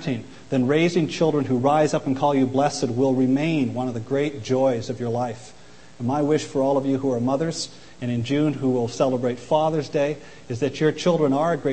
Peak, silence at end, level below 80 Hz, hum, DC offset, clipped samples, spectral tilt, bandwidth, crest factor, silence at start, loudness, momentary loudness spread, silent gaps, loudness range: -6 dBFS; 0 s; -58 dBFS; none; 0.5%; under 0.1%; -6.5 dB/octave; 8.8 kHz; 16 dB; 0 s; -22 LUFS; 8 LU; none; 4 LU